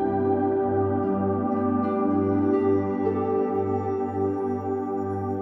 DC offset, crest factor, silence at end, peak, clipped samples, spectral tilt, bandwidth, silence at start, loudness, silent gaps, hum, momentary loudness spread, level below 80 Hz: under 0.1%; 12 dB; 0 s; -12 dBFS; under 0.1%; -11 dB/octave; 3.8 kHz; 0 s; -25 LUFS; none; none; 5 LU; -62 dBFS